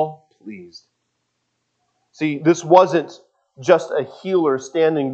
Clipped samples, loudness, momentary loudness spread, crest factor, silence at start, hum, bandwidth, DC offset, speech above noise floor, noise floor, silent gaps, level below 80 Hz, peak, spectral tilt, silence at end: under 0.1%; -18 LUFS; 23 LU; 20 dB; 0 s; none; 8.2 kHz; under 0.1%; 55 dB; -73 dBFS; none; -74 dBFS; 0 dBFS; -6 dB/octave; 0 s